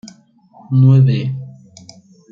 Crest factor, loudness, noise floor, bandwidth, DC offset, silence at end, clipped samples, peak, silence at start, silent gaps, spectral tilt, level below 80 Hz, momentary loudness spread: 14 dB; -13 LUFS; -47 dBFS; 7.2 kHz; under 0.1%; 0.8 s; under 0.1%; -2 dBFS; 0.05 s; none; -9 dB/octave; -58 dBFS; 19 LU